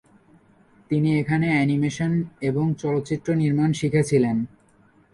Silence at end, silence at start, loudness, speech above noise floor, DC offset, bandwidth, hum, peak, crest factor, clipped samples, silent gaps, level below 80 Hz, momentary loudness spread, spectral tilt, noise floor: 0.65 s; 0.9 s; -22 LUFS; 36 dB; under 0.1%; 11.5 kHz; none; -8 dBFS; 16 dB; under 0.1%; none; -54 dBFS; 5 LU; -7 dB/octave; -57 dBFS